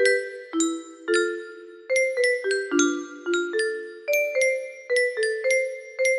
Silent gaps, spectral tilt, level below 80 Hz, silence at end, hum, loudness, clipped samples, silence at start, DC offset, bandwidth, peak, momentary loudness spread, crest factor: none; -0.5 dB/octave; -74 dBFS; 0 s; none; -24 LUFS; under 0.1%; 0 s; under 0.1%; 13 kHz; -8 dBFS; 9 LU; 18 dB